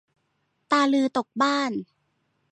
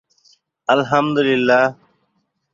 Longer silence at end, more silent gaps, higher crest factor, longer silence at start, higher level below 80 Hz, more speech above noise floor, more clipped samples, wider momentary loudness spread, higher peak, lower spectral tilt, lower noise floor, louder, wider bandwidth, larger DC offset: about the same, 0.7 s vs 0.8 s; neither; about the same, 18 dB vs 18 dB; about the same, 0.7 s vs 0.7 s; second, -76 dBFS vs -62 dBFS; about the same, 50 dB vs 53 dB; neither; about the same, 8 LU vs 6 LU; second, -8 dBFS vs -2 dBFS; second, -4 dB/octave vs -6 dB/octave; first, -73 dBFS vs -68 dBFS; second, -23 LUFS vs -17 LUFS; first, 9.6 kHz vs 7.4 kHz; neither